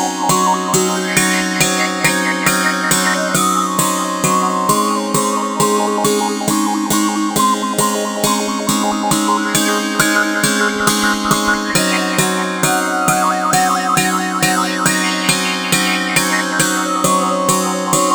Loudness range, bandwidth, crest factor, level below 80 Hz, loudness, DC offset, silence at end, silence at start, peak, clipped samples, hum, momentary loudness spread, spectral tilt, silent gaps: 1 LU; over 20 kHz; 16 dB; -48 dBFS; -14 LUFS; under 0.1%; 0 s; 0 s; 0 dBFS; under 0.1%; none; 2 LU; -3 dB/octave; none